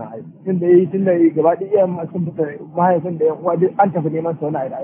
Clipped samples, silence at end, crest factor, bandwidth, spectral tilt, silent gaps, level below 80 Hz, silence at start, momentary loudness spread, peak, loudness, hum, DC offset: under 0.1%; 0 s; 16 dB; 3.3 kHz; -13 dB/octave; none; -66 dBFS; 0 s; 10 LU; -2 dBFS; -17 LUFS; none; under 0.1%